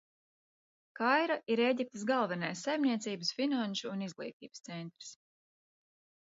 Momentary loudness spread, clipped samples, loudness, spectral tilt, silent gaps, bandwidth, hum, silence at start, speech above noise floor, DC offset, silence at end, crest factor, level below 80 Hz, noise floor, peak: 15 LU; under 0.1%; -33 LUFS; -3 dB/octave; 4.33-4.40 s; 7.6 kHz; none; 0.95 s; over 56 dB; under 0.1%; 1.2 s; 20 dB; -86 dBFS; under -90 dBFS; -14 dBFS